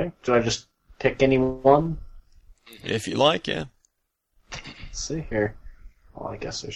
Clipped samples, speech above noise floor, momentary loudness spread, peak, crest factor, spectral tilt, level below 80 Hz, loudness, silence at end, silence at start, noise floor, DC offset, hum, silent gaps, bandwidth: under 0.1%; 53 dB; 18 LU; -4 dBFS; 20 dB; -5 dB/octave; -44 dBFS; -24 LUFS; 0 s; 0 s; -76 dBFS; under 0.1%; none; none; 13 kHz